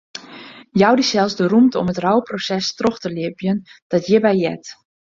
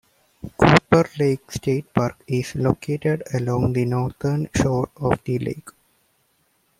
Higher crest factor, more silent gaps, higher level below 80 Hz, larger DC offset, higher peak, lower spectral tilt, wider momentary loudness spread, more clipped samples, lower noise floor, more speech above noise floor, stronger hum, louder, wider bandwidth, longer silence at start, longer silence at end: about the same, 16 dB vs 20 dB; first, 3.82-3.90 s vs none; second, -56 dBFS vs -46 dBFS; neither; about the same, -2 dBFS vs 0 dBFS; about the same, -5.5 dB/octave vs -6.5 dB/octave; first, 19 LU vs 10 LU; neither; second, -39 dBFS vs -65 dBFS; second, 22 dB vs 43 dB; neither; first, -18 LUFS vs -21 LUFS; second, 7.6 kHz vs 15 kHz; second, 0.15 s vs 0.45 s; second, 0.4 s vs 1.1 s